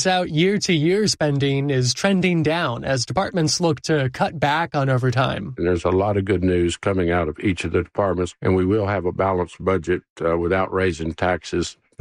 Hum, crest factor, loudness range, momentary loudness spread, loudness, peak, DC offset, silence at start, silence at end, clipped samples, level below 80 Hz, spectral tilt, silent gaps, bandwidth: none; 16 dB; 2 LU; 5 LU; -21 LUFS; -4 dBFS; under 0.1%; 0 s; 0.3 s; under 0.1%; -44 dBFS; -5.5 dB/octave; 10.10-10.16 s; 14.5 kHz